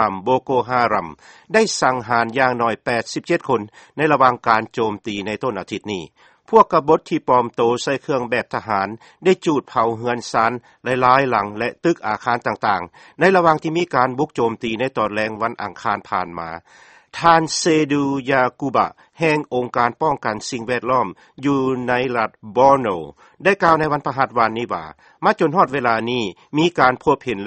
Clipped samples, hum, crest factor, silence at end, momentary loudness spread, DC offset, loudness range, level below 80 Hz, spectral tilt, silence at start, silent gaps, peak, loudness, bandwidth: under 0.1%; none; 18 dB; 0 s; 10 LU; under 0.1%; 2 LU; -54 dBFS; -5 dB/octave; 0 s; none; 0 dBFS; -19 LUFS; 8.8 kHz